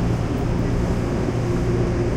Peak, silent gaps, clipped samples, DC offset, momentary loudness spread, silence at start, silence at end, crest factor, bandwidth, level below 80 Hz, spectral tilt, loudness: -8 dBFS; none; under 0.1%; under 0.1%; 1 LU; 0 s; 0 s; 12 dB; 11.5 kHz; -28 dBFS; -7.5 dB/octave; -22 LUFS